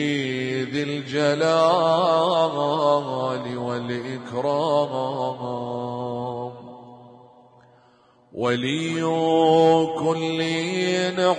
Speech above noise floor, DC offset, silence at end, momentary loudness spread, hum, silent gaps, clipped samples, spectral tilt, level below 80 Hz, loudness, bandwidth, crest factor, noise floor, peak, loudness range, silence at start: 35 dB; under 0.1%; 0 s; 11 LU; none; none; under 0.1%; -5.5 dB/octave; -70 dBFS; -22 LUFS; 10 kHz; 16 dB; -57 dBFS; -6 dBFS; 9 LU; 0 s